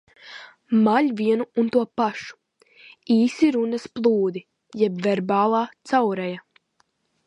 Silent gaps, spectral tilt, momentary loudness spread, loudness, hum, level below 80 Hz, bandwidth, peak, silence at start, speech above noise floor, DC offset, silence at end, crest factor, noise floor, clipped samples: none; -6.5 dB/octave; 19 LU; -22 LUFS; none; -70 dBFS; 9.2 kHz; -6 dBFS; 0.25 s; 47 dB; under 0.1%; 0.9 s; 16 dB; -68 dBFS; under 0.1%